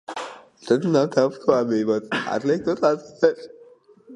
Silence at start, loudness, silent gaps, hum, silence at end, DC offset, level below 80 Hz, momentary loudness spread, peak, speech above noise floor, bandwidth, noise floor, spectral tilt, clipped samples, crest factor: 0.1 s; -22 LUFS; none; none; 0 s; under 0.1%; -66 dBFS; 14 LU; -2 dBFS; 30 dB; 10.5 kHz; -51 dBFS; -6 dB/octave; under 0.1%; 20 dB